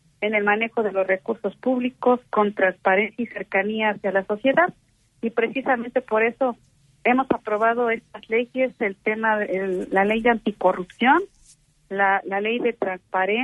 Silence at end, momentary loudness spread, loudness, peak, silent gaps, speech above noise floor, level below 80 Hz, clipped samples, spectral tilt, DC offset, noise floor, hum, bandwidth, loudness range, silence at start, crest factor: 0 s; 6 LU; -22 LUFS; -4 dBFS; none; 34 dB; -62 dBFS; under 0.1%; -6.5 dB/octave; under 0.1%; -56 dBFS; none; 11 kHz; 1 LU; 0.2 s; 18 dB